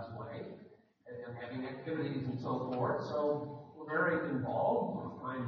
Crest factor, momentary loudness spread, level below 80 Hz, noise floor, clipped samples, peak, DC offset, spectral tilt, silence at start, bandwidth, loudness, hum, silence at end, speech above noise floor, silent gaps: 18 dB; 14 LU; -76 dBFS; -59 dBFS; under 0.1%; -20 dBFS; under 0.1%; -6 dB/octave; 0 s; 6.6 kHz; -37 LUFS; none; 0 s; 25 dB; none